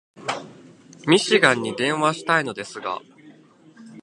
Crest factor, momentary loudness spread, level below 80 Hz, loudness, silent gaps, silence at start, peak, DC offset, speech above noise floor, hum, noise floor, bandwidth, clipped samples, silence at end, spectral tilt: 24 dB; 14 LU; -68 dBFS; -21 LUFS; none; 0.2 s; 0 dBFS; under 0.1%; 30 dB; none; -51 dBFS; 11.5 kHz; under 0.1%; 0 s; -4 dB/octave